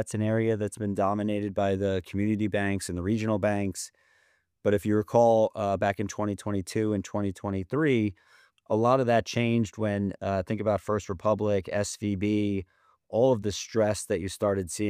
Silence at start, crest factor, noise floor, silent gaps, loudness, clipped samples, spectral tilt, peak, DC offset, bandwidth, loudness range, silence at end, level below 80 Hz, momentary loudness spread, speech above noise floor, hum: 0 s; 20 dB; -68 dBFS; none; -27 LUFS; under 0.1%; -6 dB/octave; -8 dBFS; under 0.1%; 15.5 kHz; 2 LU; 0 s; -58 dBFS; 7 LU; 41 dB; none